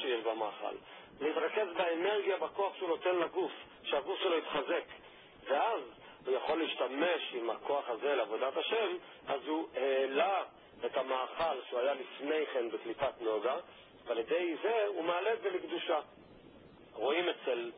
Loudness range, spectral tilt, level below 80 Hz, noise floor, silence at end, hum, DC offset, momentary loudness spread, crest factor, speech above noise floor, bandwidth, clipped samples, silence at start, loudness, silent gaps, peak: 2 LU; 1.5 dB/octave; -76 dBFS; -57 dBFS; 0 s; none; under 0.1%; 9 LU; 16 dB; 22 dB; 3.8 kHz; under 0.1%; 0 s; -35 LUFS; none; -18 dBFS